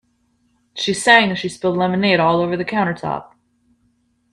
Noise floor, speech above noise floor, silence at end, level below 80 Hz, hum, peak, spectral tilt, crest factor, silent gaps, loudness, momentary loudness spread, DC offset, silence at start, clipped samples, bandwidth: -63 dBFS; 46 dB; 1.1 s; -58 dBFS; none; 0 dBFS; -4.5 dB/octave; 20 dB; none; -17 LUFS; 13 LU; under 0.1%; 0.75 s; under 0.1%; 12 kHz